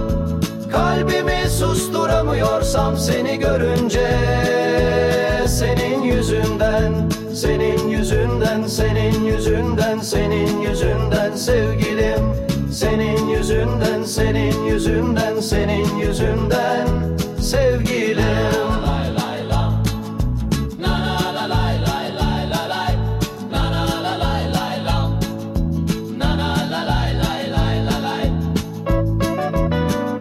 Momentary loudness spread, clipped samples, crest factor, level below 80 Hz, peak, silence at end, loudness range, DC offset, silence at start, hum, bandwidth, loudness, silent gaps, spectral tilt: 4 LU; under 0.1%; 14 dB; -26 dBFS; -4 dBFS; 0 s; 3 LU; under 0.1%; 0 s; none; 16 kHz; -19 LUFS; none; -5.5 dB/octave